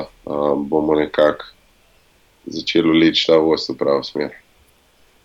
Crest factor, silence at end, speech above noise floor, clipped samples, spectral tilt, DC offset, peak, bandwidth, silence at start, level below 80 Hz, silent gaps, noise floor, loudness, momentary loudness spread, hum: 16 dB; 0.9 s; 39 dB; under 0.1%; -5.5 dB/octave; under 0.1%; -2 dBFS; 7.6 kHz; 0 s; -52 dBFS; none; -55 dBFS; -17 LUFS; 14 LU; none